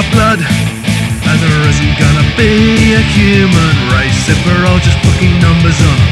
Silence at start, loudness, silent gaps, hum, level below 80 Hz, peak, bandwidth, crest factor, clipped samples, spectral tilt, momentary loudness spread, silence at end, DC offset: 0 s; -9 LUFS; none; none; -20 dBFS; 0 dBFS; 13.5 kHz; 8 dB; 0.2%; -5.5 dB/octave; 4 LU; 0 s; under 0.1%